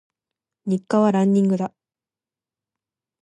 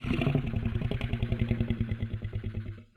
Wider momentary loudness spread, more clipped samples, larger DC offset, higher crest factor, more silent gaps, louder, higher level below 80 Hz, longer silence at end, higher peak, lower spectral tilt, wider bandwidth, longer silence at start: first, 12 LU vs 8 LU; neither; neither; about the same, 16 dB vs 16 dB; neither; first, -20 LUFS vs -32 LUFS; second, -72 dBFS vs -40 dBFS; first, 1.55 s vs 0.1 s; first, -6 dBFS vs -14 dBFS; about the same, -8 dB/octave vs -8.5 dB/octave; first, 9.2 kHz vs 6.2 kHz; first, 0.65 s vs 0 s